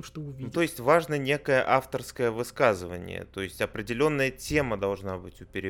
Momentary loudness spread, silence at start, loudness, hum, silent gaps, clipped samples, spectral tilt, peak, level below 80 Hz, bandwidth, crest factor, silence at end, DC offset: 14 LU; 0 s; -27 LUFS; none; none; under 0.1%; -5.5 dB/octave; -8 dBFS; -52 dBFS; 18 kHz; 20 dB; 0 s; under 0.1%